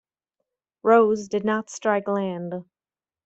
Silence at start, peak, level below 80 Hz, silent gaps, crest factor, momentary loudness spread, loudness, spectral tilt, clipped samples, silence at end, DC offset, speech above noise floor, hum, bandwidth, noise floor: 0.85 s; -6 dBFS; -70 dBFS; none; 20 dB; 14 LU; -23 LUFS; -6 dB/octave; under 0.1%; 0.65 s; under 0.1%; over 68 dB; none; 8.2 kHz; under -90 dBFS